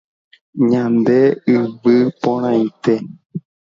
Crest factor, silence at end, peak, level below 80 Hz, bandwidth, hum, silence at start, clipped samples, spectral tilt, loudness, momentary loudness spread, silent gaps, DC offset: 16 dB; 0.3 s; -2 dBFS; -64 dBFS; 7.2 kHz; none; 0.55 s; under 0.1%; -8.5 dB/octave; -16 LUFS; 17 LU; 3.26-3.30 s; under 0.1%